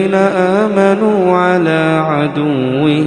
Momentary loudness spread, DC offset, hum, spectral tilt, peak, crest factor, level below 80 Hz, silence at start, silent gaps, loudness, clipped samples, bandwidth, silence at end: 3 LU; under 0.1%; none; -7.5 dB/octave; 0 dBFS; 12 dB; -54 dBFS; 0 s; none; -12 LUFS; under 0.1%; 10 kHz; 0 s